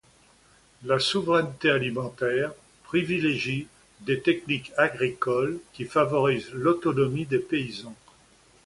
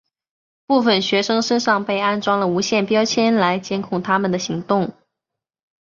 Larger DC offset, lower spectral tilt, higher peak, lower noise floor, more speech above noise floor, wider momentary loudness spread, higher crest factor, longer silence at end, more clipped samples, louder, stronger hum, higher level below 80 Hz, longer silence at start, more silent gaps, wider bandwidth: neither; about the same, -5.5 dB/octave vs -4.5 dB/octave; second, -6 dBFS vs -2 dBFS; second, -59 dBFS vs -84 dBFS; second, 33 dB vs 66 dB; first, 10 LU vs 6 LU; about the same, 20 dB vs 16 dB; second, 0.7 s vs 1 s; neither; second, -26 LUFS vs -19 LUFS; neither; about the same, -60 dBFS vs -62 dBFS; about the same, 0.8 s vs 0.7 s; neither; first, 11.5 kHz vs 7.4 kHz